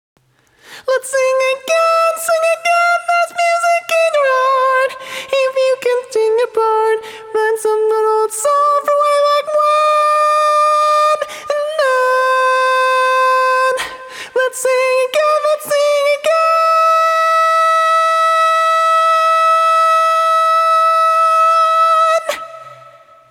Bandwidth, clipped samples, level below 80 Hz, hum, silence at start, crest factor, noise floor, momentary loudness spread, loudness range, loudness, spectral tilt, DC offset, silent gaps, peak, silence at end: 18 kHz; under 0.1%; -68 dBFS; none; 0.7 s; 10 dB; -51 dBFS; 6 LU; 4 LU; -13 LUFS; 0.5 dB/octave; under 0.1%; none; -2 dBFS; 0.55 s